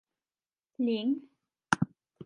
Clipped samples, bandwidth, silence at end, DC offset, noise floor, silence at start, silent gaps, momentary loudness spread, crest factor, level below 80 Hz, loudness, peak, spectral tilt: under 0.1%; 11.5 kHz; 0 s; under 0.1%; under -90 dBFS; 0.8 s; none; 7 LU; 28 dB; -68 dBFS; -32 LUFS; -6 dBFS; -5.5 dB/octave